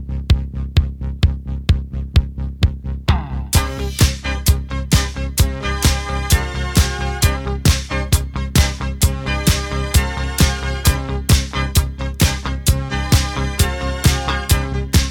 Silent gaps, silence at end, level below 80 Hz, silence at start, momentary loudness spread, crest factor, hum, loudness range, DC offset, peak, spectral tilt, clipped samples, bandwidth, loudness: none; 0 s; -20 dBFS; 0 s; 4 LU; 16 dB; none; 2 LU; under 0.1%; 0 dBFS; -4.5 dB/octave; under 0.1%; 19 kHz; -18 LUFS